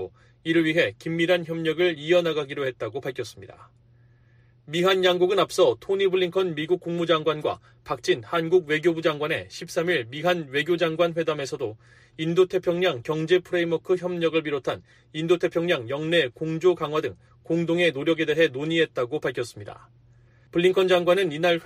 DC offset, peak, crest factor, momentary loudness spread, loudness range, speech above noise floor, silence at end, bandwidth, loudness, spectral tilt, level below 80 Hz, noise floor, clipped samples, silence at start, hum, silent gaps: under 0.1%; -8 dBFS; 18 dB; 11 LU; 3 LU; 33 dB; 0 s; 15.5 kHz; -24 LUFS; -5.5 dB/octave; -64 dBFS; -57 dBFS; under 0.1%; 0 s; none; none